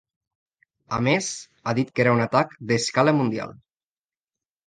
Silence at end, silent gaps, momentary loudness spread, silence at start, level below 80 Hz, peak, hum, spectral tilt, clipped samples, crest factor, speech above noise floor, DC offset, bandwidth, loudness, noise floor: 1.15 s; none; 11 LU; 0.9 s; -62 dBFS; -4 dBFS; none; -5 dB/octave; under 0.1%; 20 dB; over 68 dB; under 0.1%; 9.8 kHz; -23 LUFS; under -90 dBFS